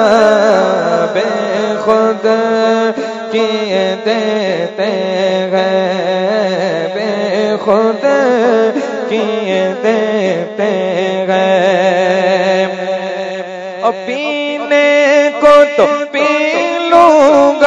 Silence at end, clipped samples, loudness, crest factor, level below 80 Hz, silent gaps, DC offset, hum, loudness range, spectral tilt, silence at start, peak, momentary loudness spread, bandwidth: 0 s; 0.5%; -12 LUFS; 12 dB; -56 dBFS; none; under 0.1%; none; 3 LU; -5 dB/octave; 0 s; 0 dBFS; 8 LU; 7.8 kHz